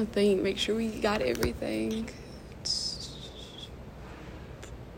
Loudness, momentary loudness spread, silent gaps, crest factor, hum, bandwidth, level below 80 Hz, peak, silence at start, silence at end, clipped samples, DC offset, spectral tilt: -30 LUFS; 18 LU; none; 20 dB; none; 16 kHz; -48 dBFS; -12 dBFS; 0 s; 0 s; under 0.1%; under 0.1%; -4.5 dB/octave